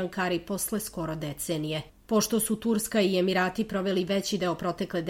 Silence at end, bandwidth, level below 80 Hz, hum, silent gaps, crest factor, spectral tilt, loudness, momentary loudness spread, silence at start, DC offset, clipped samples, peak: 0 s; 16.5 kHz; -56 dBFS; none; none; 16 dB; -4.5 dB/octave; -28 LUFS; 8 LU; 0 s; under 0.1%; under 0.1%; -12 dBFS